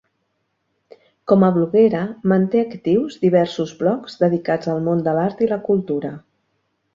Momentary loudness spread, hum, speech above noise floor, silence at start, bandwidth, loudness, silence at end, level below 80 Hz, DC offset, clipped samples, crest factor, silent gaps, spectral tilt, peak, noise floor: 7 LU; none; 53 dB; 1.25 s; 7.4 kHz; -19 LUFS; 0.75 s; -60 dBFS; under 0.1%; under 0.1%; 18 dB; none; -8.5 dB/octave; -2 dBFS; -71 dBFS